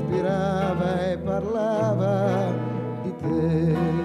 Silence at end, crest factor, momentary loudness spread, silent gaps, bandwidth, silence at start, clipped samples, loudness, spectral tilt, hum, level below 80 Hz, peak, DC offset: 0 s; 12 dB; 6 LU; none; 10 kHz; 0 s; under 0.1%; -24 LUFS; -8.5 dB/octave; none; -50 dBFS; -12 dBFS; under 0.1%